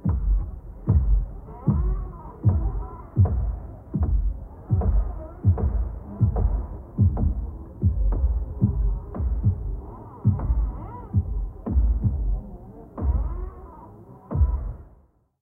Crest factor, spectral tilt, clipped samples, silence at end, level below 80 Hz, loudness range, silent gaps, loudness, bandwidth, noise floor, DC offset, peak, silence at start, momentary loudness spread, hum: 16 dB; -13.5 dB/octave; under 0.1%; 0.55 s; -26 dBFS; 3 LU; none; -26 LUFS; 2 kHz; -57 dBFS; under 0.1%; -8 dBFS; 0 s; 14 LU; none